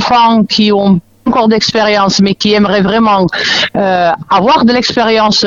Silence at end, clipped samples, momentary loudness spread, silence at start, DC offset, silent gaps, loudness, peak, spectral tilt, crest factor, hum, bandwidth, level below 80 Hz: 0 s; under 0.1%; 3 LU; 0 s; under 0.1%; none; -9 LUFS; 0 dBFS; -4.5 dB/octave; 10 dB; none; 7.6 kHz; -42 dBFS